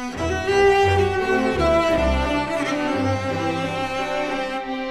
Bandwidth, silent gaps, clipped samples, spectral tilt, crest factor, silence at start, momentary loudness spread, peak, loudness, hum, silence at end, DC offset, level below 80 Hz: 13.5 kHz; none; under 0.1%; -5.5 dB/octave; 14 dB; 0 s; 8 LU; -6 dBFS; -21 LUFS; none; 0 s; under 0.1%; -34 dBFS